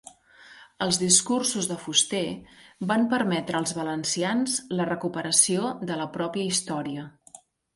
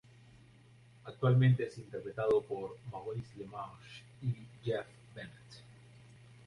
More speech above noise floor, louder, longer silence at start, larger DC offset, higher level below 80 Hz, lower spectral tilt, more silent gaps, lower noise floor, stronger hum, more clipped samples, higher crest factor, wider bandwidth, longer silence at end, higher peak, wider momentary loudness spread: about the same, 26 dB vs 25 dB; first, -25 LUFS vs -35 LUFS; second, 0.05 s vs 1.05 s; neither; about the same, -64 dBFS vs -68 dBFS; second, -3 dB/octave vs -8.5 dB/octave; neither; second, -52 dBFS vs -60 dBFS; neither; neither; first, 24 dB vs 18 dB; first, 12 kHz vs 10.5 kHz; second, 0.4 s vs 0.75 s; first, -4 dBFS vs -18 dBFS; second, 12 LU vs 24 LU